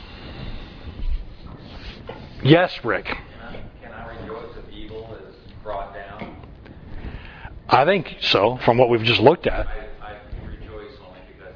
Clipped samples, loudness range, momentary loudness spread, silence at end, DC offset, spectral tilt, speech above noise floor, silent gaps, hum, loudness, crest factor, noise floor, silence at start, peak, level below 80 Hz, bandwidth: under 0.1%; 17 LU; 23 LU; 0 s; under 0.1%; -7 dB/octave; 26 dB; none; none; -19 LUFS; 24 dB; -43 dBFS; 0 s; 0 dBFS; -36 dBFS; 5.4 kHz